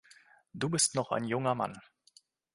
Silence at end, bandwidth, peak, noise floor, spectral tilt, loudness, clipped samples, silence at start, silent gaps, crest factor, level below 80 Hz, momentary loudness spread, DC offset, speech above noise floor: 0.75 s; 11.5 kHz; -14 dBFS; -65 dBFS; -3.5 dB/octave; -31 LUFS; under 0.1%; 0.55 s; none; 22 dB; -70 dBFS; 17 LU; under 0.1%; 33 dB